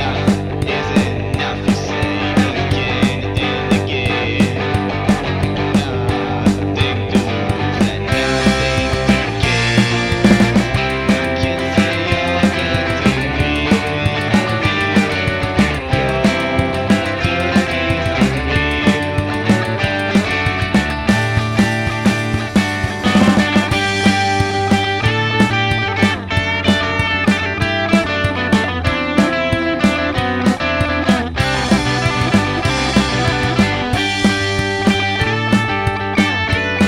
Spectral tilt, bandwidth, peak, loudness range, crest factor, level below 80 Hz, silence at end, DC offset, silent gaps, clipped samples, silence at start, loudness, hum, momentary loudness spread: -5.5 dB/octave; 14 kHz; 0 dBFS; 2 LU; 16 dB; -32 dBFS; 0 s; under 0.1%; none; under 0.1%; 0 s; -16 LUFS; none; 3 LU